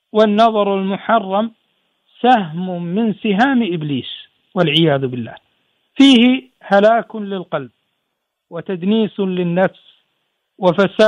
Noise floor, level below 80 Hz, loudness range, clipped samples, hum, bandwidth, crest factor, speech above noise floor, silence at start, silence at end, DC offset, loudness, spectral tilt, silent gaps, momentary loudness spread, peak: -74 dBFS; -64 dBFS; 6 LU; under 0.1%; none; 10.5 kHz; 16 dB; 59 dB; 0.15 s; 0 s; under 0.1%; -16 LUFS; -6.5 dB/octave; none; 14 LU; 0 dBFS